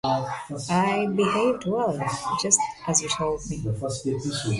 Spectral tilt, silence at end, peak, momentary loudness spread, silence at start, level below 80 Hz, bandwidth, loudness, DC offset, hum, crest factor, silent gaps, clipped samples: -4 dB/octave; 0 s; -6 dBFS; 8 LU; 0.05 s; -50 dBFS; 11.5 kHz; -25 LUFS; under 0.1%; none; 20 dB; none; under 0.1%